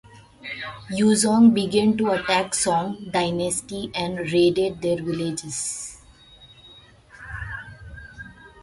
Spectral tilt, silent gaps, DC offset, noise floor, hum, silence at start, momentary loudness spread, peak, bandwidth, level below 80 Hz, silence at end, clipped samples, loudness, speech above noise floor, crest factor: -4 dB/octave; none; under 0.1%; -49 dBFS; none; 0.15 s; 23 LU; -6 dBFS; 11.5 kHz; -50 dBFS; 0.15 s; under 0.1%; -22 LUFS; 28 dB; 18 dB